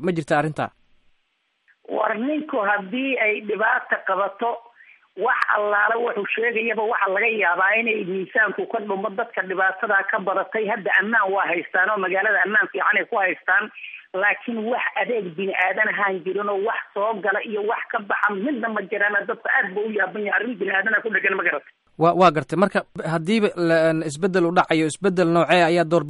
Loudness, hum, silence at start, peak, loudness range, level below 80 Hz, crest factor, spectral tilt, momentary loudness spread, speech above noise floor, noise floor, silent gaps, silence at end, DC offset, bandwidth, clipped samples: -21 LUFS; none; 0 s; -4 dBFS; 3 LU; -66 dBFS; 18 dB; -5.5 dB/octave; 7 LU; 48 dB; -70 dBFS; none; 0 s; under 0.1%; 11.5 kHz; under 0.1%